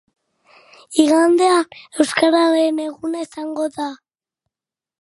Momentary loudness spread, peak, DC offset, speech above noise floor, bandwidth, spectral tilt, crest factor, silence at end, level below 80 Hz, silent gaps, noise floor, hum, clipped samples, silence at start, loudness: 13 LU; 0 dBFS; under 0.1%; 73 dB; 11.5 kHz; -2.5 dB/octave; 18 dB; 1.1 s; -70 dBFS; none; -89 dBFS; none; under 0.1%; 0.9 s; -17 LUFS